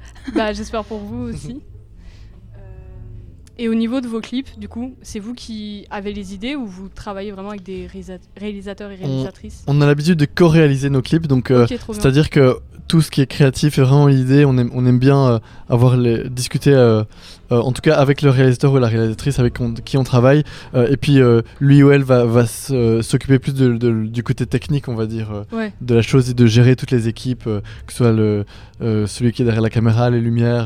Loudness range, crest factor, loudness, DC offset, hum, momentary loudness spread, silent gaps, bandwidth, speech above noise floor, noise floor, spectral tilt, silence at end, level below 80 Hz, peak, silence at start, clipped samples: 14 LU; 16 dB; -16 LUFS; under 0.1%; none; 17 LU; none; 14.5 kHz; 23 dB; -38 dBFS; -7 dB/octave; 0 s; -38 dBFS; 0 dBFS; 0 s; under 0.1%